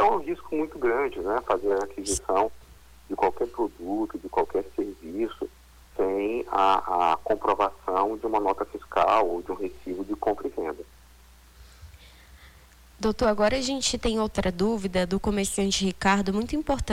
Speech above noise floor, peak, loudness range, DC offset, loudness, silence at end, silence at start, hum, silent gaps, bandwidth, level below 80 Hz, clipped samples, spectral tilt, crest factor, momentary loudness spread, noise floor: 27 dB; -10 dBFS; 5 LU; under 0.1%; -26 LUFS; 0 s; 0 s; none; none; 18 kHz; -46 dBFS; under 0.1%; -4.5 dB/octave; 18 dB; 10 LU; -53 dBFS